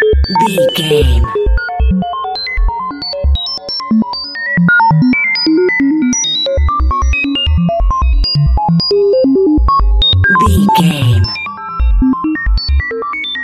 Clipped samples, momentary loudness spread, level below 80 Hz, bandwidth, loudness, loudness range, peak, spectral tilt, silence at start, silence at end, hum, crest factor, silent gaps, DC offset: under 0.1%; 8 LU; -16 dBFS; 14 kHz; -12 LUFS; 4 LU; 0 dBFS; -5 dB/octave; 0 s; 0 s; none; 12 dB; none; under 0.1%